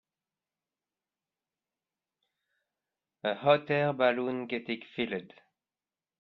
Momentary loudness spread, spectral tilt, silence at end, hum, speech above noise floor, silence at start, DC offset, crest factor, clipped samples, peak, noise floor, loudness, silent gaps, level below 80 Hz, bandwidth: 10 LU; -8.5 dB/octave; 0.95 s; none; over 60 dB; 3.25 s; under 0.1%; 22 dB; under 0.1%; -12 dBFS; under -90 dBFS; -30 LUFS; none; -76 dBFS; 5.6 kHz